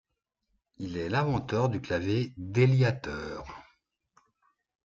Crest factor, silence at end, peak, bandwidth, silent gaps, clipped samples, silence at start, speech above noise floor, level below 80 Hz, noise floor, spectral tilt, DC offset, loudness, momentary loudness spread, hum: 20 dB; 1.25 s; -10 dBFS; 7.4 kHz; none; under 0.1%; 0.8 s; 53 dB; -56 dBFS; -81 dBFS; -7.5 dB/octave; under 0.1%; -29 LUFS; 18 LU; none